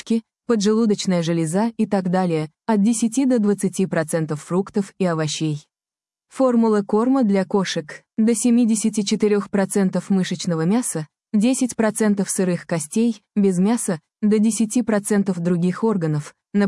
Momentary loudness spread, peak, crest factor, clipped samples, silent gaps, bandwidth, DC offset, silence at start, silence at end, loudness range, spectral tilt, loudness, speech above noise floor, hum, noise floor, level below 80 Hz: 7 LU; -6 dBFS; 12 dB; under 0.1%; none; 12 kHz; under 0.1%; 0.05 s; 0 s; 2 LU; -5.5 dB/octave; -20 LUFS; over 71 dB; none; under -90 dBFS; -66 dBFS